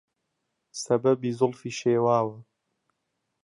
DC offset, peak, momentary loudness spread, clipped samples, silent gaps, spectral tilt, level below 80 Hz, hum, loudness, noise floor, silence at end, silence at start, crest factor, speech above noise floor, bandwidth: under 0.1%; -8 dBFS; 11 LU; under 0.1%; none; -6 dB/octave; -72 dBFS; none; -25 LUFS; -80 dBFS; 1 s; 0.75 s; 18 dB; 55 dB; 11.5 kHz